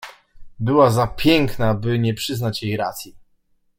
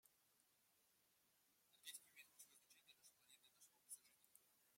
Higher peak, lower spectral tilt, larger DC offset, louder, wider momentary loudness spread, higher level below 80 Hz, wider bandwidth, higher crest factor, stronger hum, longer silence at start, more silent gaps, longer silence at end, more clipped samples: first, -2 dBFS vs -42 dBFS; first, -6 dB/octave vs 2 dB/octave; neither; first, -19 LUFS vs -62 LUFS; first, 13 LU vs 9 LU; first, -40 dBFS vs under -90 dBFS; about the same, 16.5 kHz vs 16.5 kHz; second, 18 dB vs 28 dB; neither; about the same, 0 s vs 0.05 s; neither; first, 0.6 s vs 0 s; neither